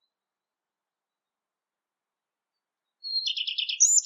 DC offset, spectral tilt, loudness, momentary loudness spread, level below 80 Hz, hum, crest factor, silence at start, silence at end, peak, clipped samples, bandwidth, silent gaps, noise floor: under 0.1%; 12 dB/octave; -24 LUFS; 11 LU; under -90 dBFS; none; 22 dB; 3.05 s; 0 s; -10 dBFS; under 0.1%; 14.5 kHz; none; under -90 dBFS